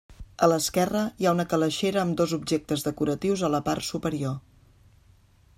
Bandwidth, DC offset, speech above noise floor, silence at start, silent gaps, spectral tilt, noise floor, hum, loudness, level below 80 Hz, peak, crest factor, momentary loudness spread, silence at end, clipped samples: 16 kHz; under 0.1%; 33 dB; 0.1 s; none; -5 dB/octave; -58 dBFS; none; -26 LUFS; -54 dBFS; -6 dBFS; 20 dB; 6 LU; 1.2 s; under 0.1%